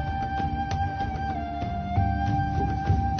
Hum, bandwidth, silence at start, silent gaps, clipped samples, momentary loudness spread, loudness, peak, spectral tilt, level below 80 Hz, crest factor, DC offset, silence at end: none; 6.6 kHz; 0 s; none; under 0.1%; 5 LU; -28 LUFS; -12 dBFS; -8 dB/octave; -34 dBFS; 14 dB; under 0.1%; 0 s